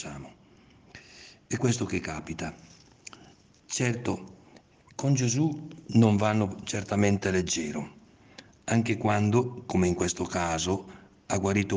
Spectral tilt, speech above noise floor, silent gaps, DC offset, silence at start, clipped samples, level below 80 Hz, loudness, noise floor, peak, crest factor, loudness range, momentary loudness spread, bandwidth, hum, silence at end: -5.5 dB/octave; 30 dB; none; under 0.1%; 0 s; under 0.1%; -60 dBFS; -28 LUFS; -57 dBFS; -8 dBFS; 20 dB; 8 LU; 23 LU; 10 kHz; none; 0 s